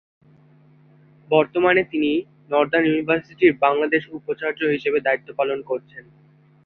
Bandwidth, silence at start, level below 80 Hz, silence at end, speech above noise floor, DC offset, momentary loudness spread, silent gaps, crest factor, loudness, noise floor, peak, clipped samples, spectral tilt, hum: 4.4 kHz; 1.3 s; -62 dBFS; 0.65 s; 33 dB; under 0.1%; 9 LU; none; 20 dB; -21 LUFS; -54 dBFS; -2 dBFS; under 0.1%; -8 dB/octave; none